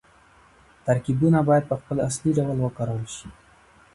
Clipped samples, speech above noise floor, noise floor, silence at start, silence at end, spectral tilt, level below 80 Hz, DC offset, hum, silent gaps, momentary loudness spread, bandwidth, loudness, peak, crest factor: under 0.1%; 32 dB; -55 dBFS; 0.85 s; 0.65 s; -7 dB/octave; -52 dBFS; under 0.1%; none; none; 13 LU; 11.5 kHz; -23 LUFS; -8 dBFS; 18 dB